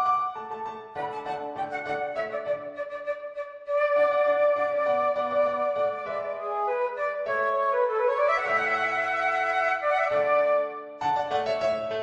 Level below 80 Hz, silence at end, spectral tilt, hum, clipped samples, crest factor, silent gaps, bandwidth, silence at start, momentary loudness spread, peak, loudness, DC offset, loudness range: -68 dBFS; 0 s; -4 dB/octave; none; under 0.1%; 14 dB; none; 8 kHz; 0 s; 11 LU; -12 dBFS; -26 LUFS; under 0.1%; 6 LU